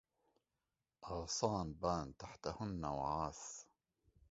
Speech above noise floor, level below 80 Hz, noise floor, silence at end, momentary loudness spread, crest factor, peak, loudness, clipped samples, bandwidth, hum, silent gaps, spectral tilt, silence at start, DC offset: over 48 dB; -60 dBFS; under -90 dBFS; 0.7 s; 12 LU; 24 dB; -20 dBFS; -43 LUFS; under 0.1%; 7.6 kHz; none; none; -5.5 dB/octave; 1 s; under 0.1%